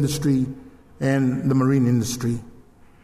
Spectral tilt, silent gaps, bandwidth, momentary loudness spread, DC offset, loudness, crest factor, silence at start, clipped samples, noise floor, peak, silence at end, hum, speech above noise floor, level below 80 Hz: -6.5 dB/octave; none; 15.5 kHz; 10 LU; under 0.1%; -22 LUFS; 14 dB; 0 s; under 0.1%; -49 dBFS; -8 dBFS; 0.55 s; none; 28 dB; -48 dBFS